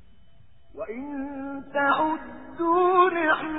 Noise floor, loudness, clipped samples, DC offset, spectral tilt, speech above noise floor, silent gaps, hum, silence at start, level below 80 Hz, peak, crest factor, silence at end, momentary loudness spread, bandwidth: -58 dBFS; -24 LUFS; under 0.1%; 0.4%; -9 dB/octave; 35 dB; none; none; 0.75 s; -58 dBFS; -8 dBFS; 18 dB; 0 s; 16 LU; 4 kHz